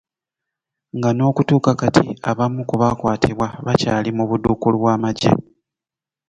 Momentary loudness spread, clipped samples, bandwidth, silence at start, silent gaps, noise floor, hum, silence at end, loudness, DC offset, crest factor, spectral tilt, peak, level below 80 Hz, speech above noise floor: 5 LU; under 0.1%; 9.4 kHz; 0.95 s; none; -89 dBFS; none; 0.9 s; -18 LUFS; under 0.1%; 18 dB; -7 dB/octave; 0 dBFS; -44 dBFS; 72 dB